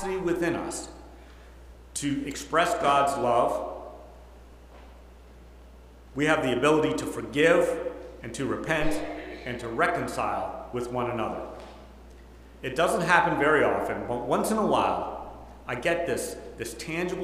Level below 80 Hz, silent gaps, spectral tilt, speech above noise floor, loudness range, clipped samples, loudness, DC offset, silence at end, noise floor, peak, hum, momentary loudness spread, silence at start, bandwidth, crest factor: -48 dBFS; none; -4.5 dB/octave; 23 dB; 6 LU; under 0.1%; -27 LUFS; under 0.1%; 0 s; -49 dBFS; -4 dBFS; none; 16 LU; 0 s; 16 kHz; 24 dB